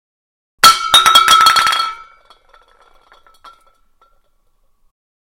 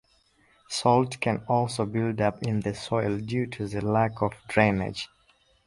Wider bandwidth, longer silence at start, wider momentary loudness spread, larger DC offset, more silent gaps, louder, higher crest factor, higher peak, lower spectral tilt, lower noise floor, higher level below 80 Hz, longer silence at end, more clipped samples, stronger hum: first, over 20 kHz vs 11.5 kHz; about the same, 0.65 s vs 0.7 s; about the same, 10 LU vs 8 LU; neither; neither; first, -9 LUFS vs -27 LUFS; second, 16 dB vs 24 dB; first, 0 dBFS vs -4 dBFS; second, 1.5 dB/octave vs -6 dB/octave; second, -58 dBFS vs -64 dBFS; about the same, -50 dBFS vs -54 dBFS; first, 3.35 s vs 0.6 s; first, 0.3% vs under 0.1%; neither